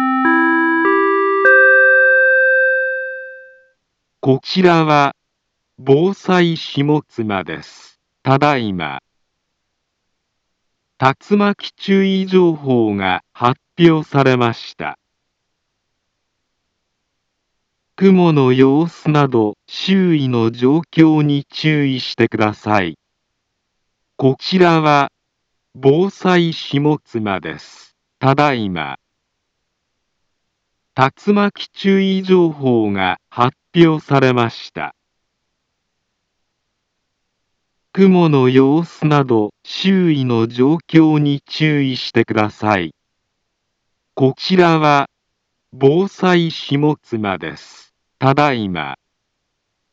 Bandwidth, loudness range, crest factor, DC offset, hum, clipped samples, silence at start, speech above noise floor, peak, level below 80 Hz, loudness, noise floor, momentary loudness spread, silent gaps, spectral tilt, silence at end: 7.6 kHz; 7 LU; 16 dB; under 0.1%; none; under 0.1%; 0 s; 58 dB; 0 dBFS; -60 dBFS; -15 LUFS; -72 dBFS; 12 LU; none; -7 dB/octave; 0.95 s